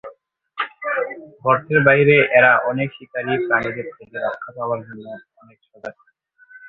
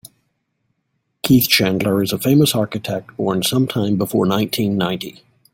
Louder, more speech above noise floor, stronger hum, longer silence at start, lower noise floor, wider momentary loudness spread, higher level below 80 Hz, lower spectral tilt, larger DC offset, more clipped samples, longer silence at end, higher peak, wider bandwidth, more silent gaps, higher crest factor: about the same, -18 LUFS vs -17 LUFS; second, 30 dB vs 54 dB; neither; second, 0.05 s vs 1.25 s; second, -49 dBFS vs -71 dBFS; first, 24 LU vs 10 LU; second, -58 dBFS vs -52 dBFS; first, -8.5 dB/octave vs -5 dB/octave; neither; neither; second, 0 s vs 0.45 s; about the same, -2 dBFS vs 0 dBFS; second, 4.3 kHz vs 17 kHz; neither; about the same, 18 dB vs 18 dB